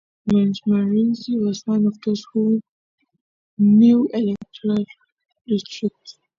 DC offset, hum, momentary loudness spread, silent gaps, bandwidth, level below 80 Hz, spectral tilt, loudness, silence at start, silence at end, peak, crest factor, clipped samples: under 0.1%; none; 12 LU; 2.69-2.98 s, 3.21-3.57 s, 5.12-5.16 s, 5.41-5.45 s; 7.2 kHz; -60 dBFS; -8 dB/octave; -20 LUFS; 0.25 s; 0.25 s; -6 dBFS; 14 dB; under 0.1%